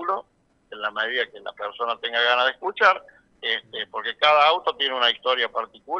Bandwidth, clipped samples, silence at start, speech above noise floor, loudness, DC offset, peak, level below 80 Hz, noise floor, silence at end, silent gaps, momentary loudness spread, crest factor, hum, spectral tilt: 7.8 kHz; under 0.1%; 0 s; 40 dB; -22 LUFS; under 0.1%; -4 dBFS; -70 dBFS; -63 dBFS; 0 s; none; 12 LU; 20 dB; none; -2 dB/octave